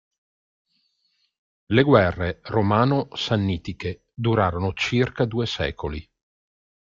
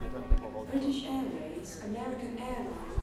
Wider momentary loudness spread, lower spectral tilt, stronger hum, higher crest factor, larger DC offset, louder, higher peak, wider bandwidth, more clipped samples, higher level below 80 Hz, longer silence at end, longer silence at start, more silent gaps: first, 14 LU vs 7 LU; about the same, -7 dB/octave vs -6 dB/octave; neither; about the same, 22 dB vs 20 dB; neither; first, -23 LUFS vs -36 LUFS; first, -2 dBFS vs -12 dBFS; second, 7.6 kHz vs 13 kHz; neither; second, -48 dBFS vs -36 dBFS; first, 0.9 s vs 0 s; first, 1.7 s vs 0 s; neither